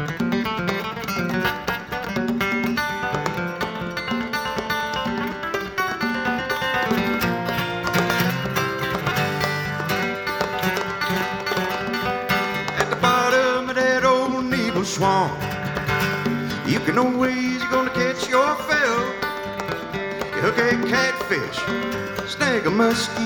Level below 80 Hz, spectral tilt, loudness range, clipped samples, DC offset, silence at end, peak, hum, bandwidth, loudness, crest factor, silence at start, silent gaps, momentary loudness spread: -48 dBFS; -4.5 dB/octave; 4 LU; under 0.1%; under 0.1%; 0 s; -2 dBFS; none; 18 kHz; -22 LUFS; 20 dB; 0 s; none; 7 LU